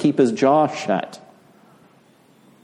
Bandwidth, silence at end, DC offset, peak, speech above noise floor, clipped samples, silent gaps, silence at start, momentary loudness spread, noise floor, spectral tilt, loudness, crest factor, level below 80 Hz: 10.5 kHz; 1.45 s; under 0.1%; -4 dBFS; 36 dB; under 0.1%; none; 0 s; 8 LU; -54 dBFS; -6 dB/octave; -19 LUFS; 18 dB; -70 dBFS